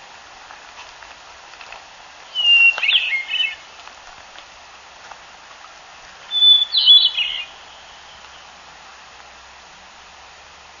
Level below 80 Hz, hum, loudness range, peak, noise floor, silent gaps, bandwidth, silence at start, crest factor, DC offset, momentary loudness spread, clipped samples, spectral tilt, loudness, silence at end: -60 dBFS; none; 11 LU; -2 dBFS; -43 dBFS; none; 7.4 kHz; 0.75 s; 20 dB; under 0.1%; 29 LU; under 0.1%; 2 dB/octave; -13 LUFS; 3.3 s